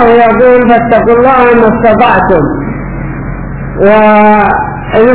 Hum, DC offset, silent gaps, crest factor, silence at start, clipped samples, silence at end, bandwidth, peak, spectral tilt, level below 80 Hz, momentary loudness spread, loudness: none; 3%; none; 6 dB; 0 s; 5%; 0 s; 4 kHz; 0 dBFS; -10.5 dB/octave; -26 dBFS; 14 LU; -6 LUFS